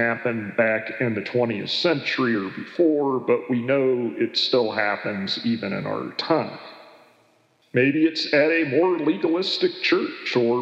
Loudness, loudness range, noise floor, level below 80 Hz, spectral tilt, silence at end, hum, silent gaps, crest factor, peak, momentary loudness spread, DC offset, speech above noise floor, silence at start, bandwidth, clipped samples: -22 LUFS; 4 LU; -61 dBFS; -82 dBFS; -6 dB/octave; 0 s; none; none; 16 dB; -6 dBFS; 7 LU; under 0.1%; 39 dB; 0 s; 8.2 kHz; under 0.1%